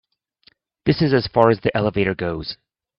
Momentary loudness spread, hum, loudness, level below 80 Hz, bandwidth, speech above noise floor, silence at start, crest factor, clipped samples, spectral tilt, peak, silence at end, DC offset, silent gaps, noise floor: 13 LU; none; -19 LUFS; -48 dBFS; 6 kHz; 40 dB; 0.85 s; 20 dB; under 0.1%; -9.5 dB/octave; 0 dBFS; 0.45 s; under 0.1%; none; -58 dBFS